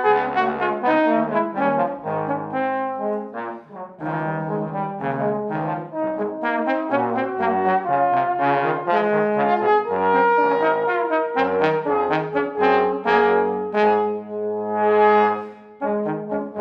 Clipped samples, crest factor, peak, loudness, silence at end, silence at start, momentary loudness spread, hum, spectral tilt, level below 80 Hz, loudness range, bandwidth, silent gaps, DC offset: under 0.1%; 16 dB; -4 dBFS; -21 LUFS; 0 s; 0 s; 9 LU; none; -8 dB/octave; -66 dBFS; 7 LU; 6 kHz; none; under 0.1%